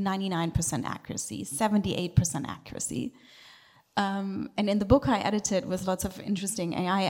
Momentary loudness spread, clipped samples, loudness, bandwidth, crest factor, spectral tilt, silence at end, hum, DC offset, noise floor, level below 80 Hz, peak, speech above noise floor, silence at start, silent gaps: 11 LU; under 0.1%; -29 LUFS; 17 kHz; 20 dB; -5 dB/octave; 0 s; none; under 0.1%; -56 dBFS; -46 dBFS; -8 dBFS; 28 dB; 0 s; none